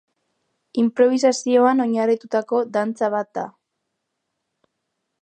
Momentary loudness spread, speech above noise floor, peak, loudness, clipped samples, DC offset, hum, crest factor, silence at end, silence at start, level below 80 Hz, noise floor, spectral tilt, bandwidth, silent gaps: 13 LU; 59 dB; -4 dBFS; -20 LUFS; under 0.1%; under 0.1%; none; 18 dB; 1.75 s; 0.75 s; -78 dBFS; -78 dBFS; -4.5 dB/octave; 9.4 kHz; none